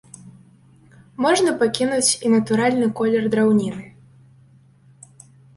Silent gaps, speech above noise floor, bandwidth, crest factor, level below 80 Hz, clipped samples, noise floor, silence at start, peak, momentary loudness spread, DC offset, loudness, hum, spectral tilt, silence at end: none; 33 dB; 11.5 kHz; 18 dB; -60 dBFS; under 0.1%; -52 dBFS; 0.25 s; -4 dBFS; 6 LU; under 0.1%; -19 LUFS; none; -4 dB/octave; 1.7 s